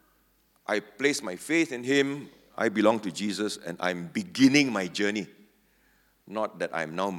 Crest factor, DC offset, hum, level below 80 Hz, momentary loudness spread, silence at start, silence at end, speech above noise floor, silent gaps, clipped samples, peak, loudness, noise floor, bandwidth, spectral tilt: 22 dB; under 0.1%; none; -74 dBFS; 11 LU; 0.7 s; 0 s; 39 dB; none; under 0.1%; -6 dBFS; -27 LUFS; -67 dBFS; 16.5 kHz; -4 dB/octave